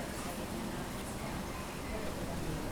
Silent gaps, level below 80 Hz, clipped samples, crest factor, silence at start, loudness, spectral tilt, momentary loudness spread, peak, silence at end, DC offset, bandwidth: none; -48 dBFS; under 0.1%; 14 dB; 0 s; -40 LUFS; -4.5 dB/octave; 2 LU; -26 dBFS; 0 s; under 0.1%; over 20 kHz